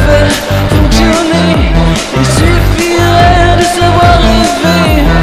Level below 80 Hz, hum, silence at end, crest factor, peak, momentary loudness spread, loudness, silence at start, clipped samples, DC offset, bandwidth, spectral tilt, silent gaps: -14 dBFS; none; 0 s; 6 dB; 0 dBFS; 4 LU; -8 LUFS; 0 s; 2%; 1%; 14.5 kHz; -5.5 dB/octave; none